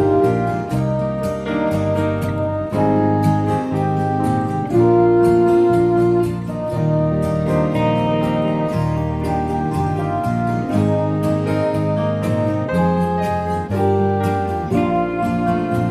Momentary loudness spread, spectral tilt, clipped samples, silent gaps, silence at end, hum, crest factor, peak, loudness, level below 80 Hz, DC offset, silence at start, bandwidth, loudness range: 7 LU; -8.5 dB/octave; under 0.1%; none; 0 s; none; 14 dB; -4 dBFS; -18 LUFS; -40 dBFS; under 0.1%; 0 s; 14 kHz; 3 LU